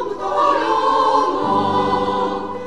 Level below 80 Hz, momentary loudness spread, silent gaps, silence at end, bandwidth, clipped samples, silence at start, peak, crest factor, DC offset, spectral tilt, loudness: -50 dBFS; 6 LU; none; 0 s; 11 kHz; under 0.1%; 0 s; -4 dBFS; 14 dB; 1%; -5.5 dB/octave; -17 LUFS